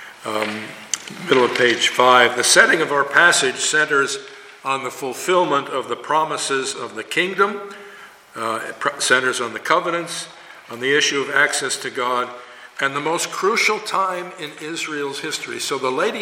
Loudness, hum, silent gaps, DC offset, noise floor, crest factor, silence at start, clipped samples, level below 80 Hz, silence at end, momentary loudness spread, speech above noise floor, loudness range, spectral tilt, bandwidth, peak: -18 LUFS; none; none; under 0.1%; -42 dBFS; 20 dB; 0 s; under 0.1%; -68 dBFS; 0 s; 16 LU; 22 dB; 7 LU; -1.5 dB/octave; 17 kHz; 0 dBFS